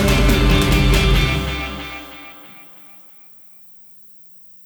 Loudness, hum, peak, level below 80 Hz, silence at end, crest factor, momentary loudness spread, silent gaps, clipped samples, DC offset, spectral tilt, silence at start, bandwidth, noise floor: -17 LUFS; 60 Hz at -55 dBFS; -2 dBFS; -22 dBFS; 1.65 s; 16 dB; 22 LU; none; under 0.1%; under 0.1%; -5 dB/octave; 0 s; over 20 kHz; -41 dBFS